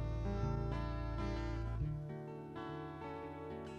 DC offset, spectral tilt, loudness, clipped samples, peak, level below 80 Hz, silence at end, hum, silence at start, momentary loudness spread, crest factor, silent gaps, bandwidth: under 0.1%; -8 dB/octave; -43 LUFS; under 0.1%; -26 dBFS; -46 dBFS; 0 s; none; 0 s; 8 LU; 16 dB; none; 7.2 kHz